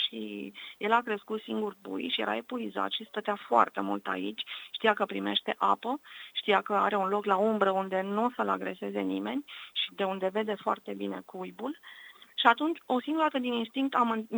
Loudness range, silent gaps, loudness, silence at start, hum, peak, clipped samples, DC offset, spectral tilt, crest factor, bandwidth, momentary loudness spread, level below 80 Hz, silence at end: 4 LU; none; -30 LUFS; 0 s; none; -6 dBFS; under 0.1%; under 0.1%; -5.5 dB/octave; 24 dB; over 20 kHz; 12 LU; -82 dBFS; 0 s